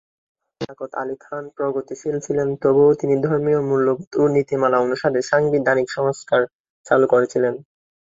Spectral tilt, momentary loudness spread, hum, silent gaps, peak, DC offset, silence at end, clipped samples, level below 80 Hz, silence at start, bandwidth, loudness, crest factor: -6.5 dB/octave; 13 LU; none; 4.07-4.11 s, 6.55-6.64 s, 6.70-6.84 s; -2 dBFS; under 0.1%; 0.55 s; under 0.1%; -60 dBFS; 0.6 s; 7.8 kHz; -19 LUFS; 18 dB